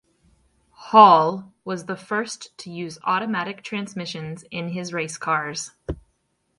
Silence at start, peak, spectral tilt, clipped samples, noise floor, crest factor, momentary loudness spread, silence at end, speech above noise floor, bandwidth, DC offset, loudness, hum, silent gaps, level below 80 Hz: 0.8 s; 0 dBFS; -4.5 dB/octave; under 0.1%; -70 dBFS; 22 dB; 21 LU; 0.65 s; 49 dB; 11.5 kHz; under 0.1%; -21 LUFS; none; none; -52 dBFS